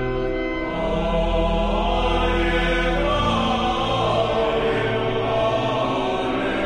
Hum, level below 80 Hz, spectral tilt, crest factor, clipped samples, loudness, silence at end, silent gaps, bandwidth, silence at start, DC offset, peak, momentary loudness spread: none; -30 dBFS; -6 dB/octave; 14 dB; under 0.1%; -21 LUFS; 0 s; none; 9.8 kHz; 0 s; under 0.1%; -8 dBFS; 4 LU